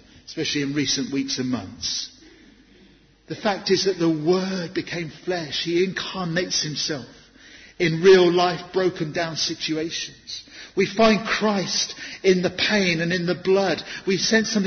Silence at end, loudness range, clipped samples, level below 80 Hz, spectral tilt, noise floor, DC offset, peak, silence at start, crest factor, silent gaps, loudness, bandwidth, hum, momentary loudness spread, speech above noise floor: 0 s; 5 LU; under 0.1%; -56 dBFS; -4 dB/octave; -54 dBFS; under 0.1%; -4 dBFS; 0.3 s; 18 dB; none; -22 LUFS; 6.6 kHz; none; 10 LU; 31 dB